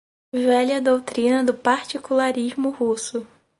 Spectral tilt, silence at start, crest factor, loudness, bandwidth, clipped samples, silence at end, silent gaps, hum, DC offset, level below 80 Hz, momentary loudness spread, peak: -3.5 dB/octave; 0.35 s; 18 dB; -21 LUFS; 11.5 kHz; under 0.1%; 0.35 s; none; none; under 0.1%; -66 dBFS; 7 LU; -4 dBFS